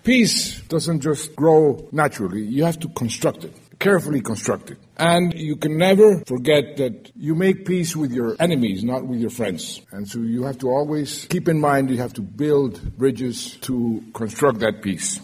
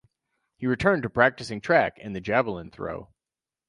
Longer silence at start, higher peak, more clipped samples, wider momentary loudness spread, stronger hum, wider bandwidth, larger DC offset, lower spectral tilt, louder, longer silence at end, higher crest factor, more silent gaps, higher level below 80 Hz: second, 0.05 s vs 0.6 s; about the same, -2 dBFS vs -4 dBFS; neither; about the same, 11 LU vs 13 LU; neither; first, 16 kHz vs 11.5 kHz; neither; second, -5 dB/octave vs -6.5 dB/octave; first, -20 LUFS vs -25 LUFS; second, 0 s vs 0.65 s; about the same, 18 dB vs 22 dB; neither; about the same, -50 dBFS vs -54 dBFS